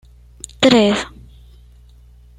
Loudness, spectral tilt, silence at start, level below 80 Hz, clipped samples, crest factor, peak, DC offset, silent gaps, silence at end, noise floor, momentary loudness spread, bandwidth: -14 LUFS; -4.5 dB/octave; 0.6 s; -44 dBFS; under 0.1%; 18 dB; -2 dBFS; under 0.1%; none; 1.3 s; -45 dBFS; 24 LU; 12 kHz